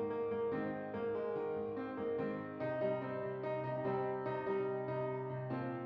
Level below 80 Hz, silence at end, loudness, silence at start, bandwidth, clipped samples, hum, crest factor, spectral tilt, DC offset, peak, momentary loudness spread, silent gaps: -76 dBFS; 0 s; -39 LUFS; 0 s; 5.6 kHz; under 0.1%; none; 14 dB; -7 dB/octave; under 0.1%; -26 dBFS; 4 LU; none